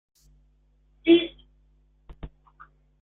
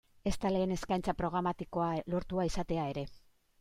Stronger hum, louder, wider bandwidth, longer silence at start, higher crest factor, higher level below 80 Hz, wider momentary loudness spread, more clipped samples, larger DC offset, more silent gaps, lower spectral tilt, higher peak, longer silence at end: neither; first, -22 LUFS vs -35 LUFS; second, 4 kHz vs 15.5 kHz; first, 1.05 s vs 0.25 s; first, 22 dB vs 16 dB; second, -54 dBFS vs -48 dBFS; first, 26 LU vs 6 LU; neither; neither; neither; about the same, -7 dB/octave vs -6.5 dB/octave; first, -6 dBFS vs -18 dBFS; first, 0.75 s vs 0.4 s